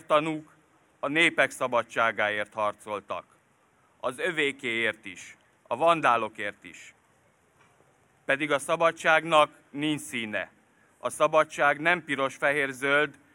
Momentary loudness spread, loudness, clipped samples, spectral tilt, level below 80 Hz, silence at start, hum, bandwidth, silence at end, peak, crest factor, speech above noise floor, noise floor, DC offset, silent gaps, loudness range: 15 LU; -26 LUFS; under 0.1%; -3.5 dB/octave; -74 dBFS; 0.1 s; none; 17 kHz; 0.2 s; -6 dBFS; 22 dB; 38 dB; -65 dBFS; under 0.1%; none; 4 LU